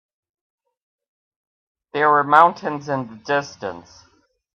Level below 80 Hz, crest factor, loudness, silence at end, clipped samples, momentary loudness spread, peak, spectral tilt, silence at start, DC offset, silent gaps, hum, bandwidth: -70 dBFS; 22 dB; -18 LUFS; 0.75 s; under 0.1%; 18 LU; 0 dBFS; -5.5 dB/octave; 1.95 s; under 0.1%; none; none; 8.6 kHz